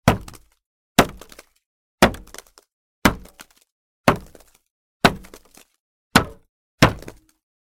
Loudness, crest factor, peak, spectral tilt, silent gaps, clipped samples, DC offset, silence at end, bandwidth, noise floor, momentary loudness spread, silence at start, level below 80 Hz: -20 LUFS; 24 dB; 0 dBFS; -4.5 dB/octave; 0.66-0.95 s, 1.66-1.98 s, 2.73-3.02 s, 3.72-4.04 s, 4.71-5.00 s, 5.80-6.11 s, 6.49-6.78 s; under 0.1%; under 0.1%; 0.65 s; 17 kHz; -48 dBFS; 20 LU; 0.05 s; -40 dBFS